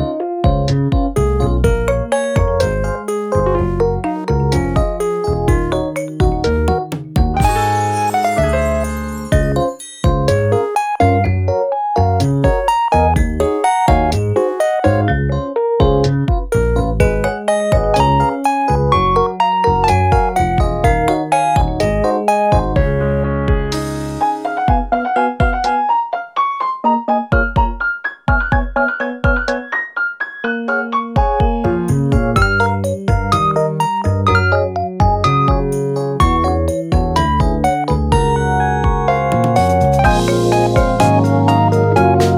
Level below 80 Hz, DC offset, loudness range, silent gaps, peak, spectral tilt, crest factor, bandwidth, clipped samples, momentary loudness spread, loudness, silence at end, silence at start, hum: -22 dBFS; under 0.1%; 3 LU; none; 0 dBFS; -6.5 dB/octave; 14 dB; 15.5 kHz; under 0.1%; 5 LU; -15 LUFS; 0 s; 0 s; none